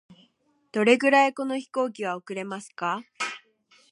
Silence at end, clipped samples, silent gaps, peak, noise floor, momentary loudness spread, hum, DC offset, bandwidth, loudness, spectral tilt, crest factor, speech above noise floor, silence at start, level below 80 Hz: 0.55 s; under 0.1%; none; -4 dBFS; -66 dBFS; 15 LU; none; under 0.1%; 11.5 kHz; -25 LUFS; -4 dB/octave; 22 dB; 42 dB; 0.1 s; -82 dBFS